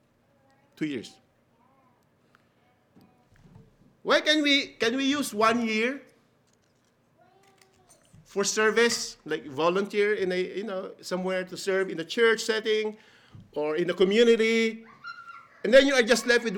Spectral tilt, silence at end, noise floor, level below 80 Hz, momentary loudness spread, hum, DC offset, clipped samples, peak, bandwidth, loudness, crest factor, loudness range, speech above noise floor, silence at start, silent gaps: -3 dB/octave; 0 s; -67 dBFS; -64 dBFS; 15 LU; none; under 0.1%; under 0.1%; -6 dBFS; 17.5 kHz; -25 LUFS; 22 dB; 8 LU; 42 dB; 0.8 s; none